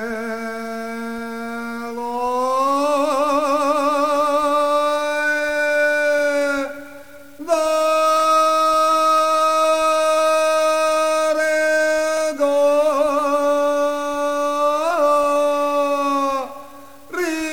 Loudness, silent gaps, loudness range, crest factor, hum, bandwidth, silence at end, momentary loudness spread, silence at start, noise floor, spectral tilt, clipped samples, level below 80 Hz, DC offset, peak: -18 LUFS; none; 4 LU; 12 dB; none; 17 kHz; 0 s; 12 LU; 0 s; -41 dBFS; -2 dB/octave; under 0.1%; -58 dBFS; 0.9%; -6 dBFS